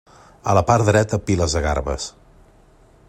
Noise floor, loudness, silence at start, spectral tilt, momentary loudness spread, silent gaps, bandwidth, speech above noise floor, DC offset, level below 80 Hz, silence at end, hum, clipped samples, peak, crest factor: -51 dBFS; -19 LUFS; 0.45 s; -5.5 dB/octave; 13 LU; none; 12.5 kHz; 33 dB; under 0.1%; -34 dBFS; 1 s; none; under 0.1%; -2 dBFS; 18 dB